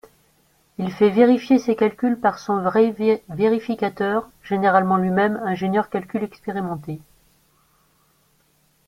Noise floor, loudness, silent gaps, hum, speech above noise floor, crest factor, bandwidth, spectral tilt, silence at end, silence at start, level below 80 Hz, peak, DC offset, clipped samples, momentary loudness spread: -62 dBFS; -20 LUFS; none; none; 42 dB; 20 dB; 15.5 kHz; -7.5 dB/octave; 1.9 s; 0.8 s; -60 dBFS; 0 dBFS; under 0.1%; under 0.1%; 12 LU